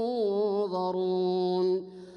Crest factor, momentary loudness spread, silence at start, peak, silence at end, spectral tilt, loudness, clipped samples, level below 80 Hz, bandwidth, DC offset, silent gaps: 10 dB; 2 LU; 0 s; -18 dBFS; 0 s; -8.5 dB/octave; -28 LUFS; under 0.1%; -76 dBFS; 6.4 kHz; under 0.1%; none